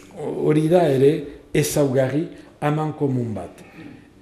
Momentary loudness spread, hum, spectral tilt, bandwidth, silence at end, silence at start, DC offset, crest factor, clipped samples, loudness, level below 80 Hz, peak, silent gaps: 16 LU; none; -6.5 dB/octave; 14.5 kHz; 0.25 s; 0.15 s; under 0.1%; 16 dB; under 0.1%; -21 LUFS; -52 dBFS; -4 dBFS; none